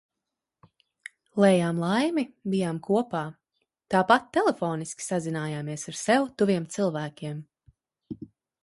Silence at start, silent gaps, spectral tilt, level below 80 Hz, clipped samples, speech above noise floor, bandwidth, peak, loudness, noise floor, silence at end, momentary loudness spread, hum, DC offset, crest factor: 1.35 s; none; -5.5 dB/octave; -68 dBFS; under 0.1%; 61 dB; 11.5 kHz; -4 dBFS; -26 LUFS; -86 dBFS; 0.4 s; 20 LU; none; under 0.1%; 24 dB